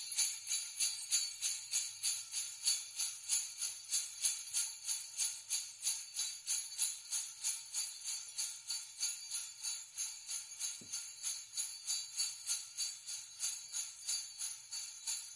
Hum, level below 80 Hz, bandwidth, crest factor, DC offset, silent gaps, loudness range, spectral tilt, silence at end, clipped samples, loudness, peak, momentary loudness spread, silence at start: none; -90 dBFS; 12 kHz; 22 dB; under 0.1%; none; 4 LU; 4.5 dB/octave; 0 s; under 0.1%; -38 LUFS; -20 dBFS; 7 LU; 0 s